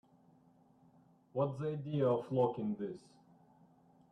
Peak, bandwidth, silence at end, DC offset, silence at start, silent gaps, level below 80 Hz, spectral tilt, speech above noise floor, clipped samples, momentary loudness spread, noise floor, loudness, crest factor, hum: -20 dBFS; 9.4 kHz; 1.15 s; under 0.1%; 1.35 s; none; -78 dBFS; -9.5 dB/octave; 31 dB; under 0.1%; 11 LU; -67 dBFS; -36 LUFS; 18 dB; none